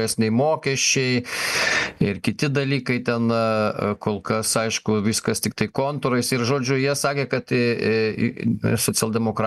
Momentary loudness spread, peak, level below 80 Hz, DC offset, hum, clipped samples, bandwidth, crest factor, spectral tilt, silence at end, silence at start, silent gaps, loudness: 4 LU; -4 dBFS; -54 dBFS; under 0.1%; none; under 0.1%; 13 kHz; 18 dB; -4 dB/octave; 0 s; 0 s; none; -22 LUFS